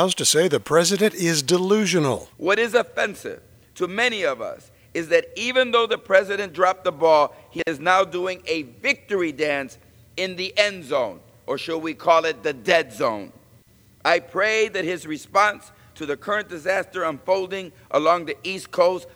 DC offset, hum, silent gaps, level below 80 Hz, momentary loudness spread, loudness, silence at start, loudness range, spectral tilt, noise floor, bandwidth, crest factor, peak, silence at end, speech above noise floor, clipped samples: under 0.1%; none; none; -62 dBFS; 11 LU; -22 LUFS; 0 s; 4 LU; -3 dB/octave; -54 dBFS; over 20 kHz; 20 dB; -2 dBFS; 0.1 s; 32 dB; under 0.1%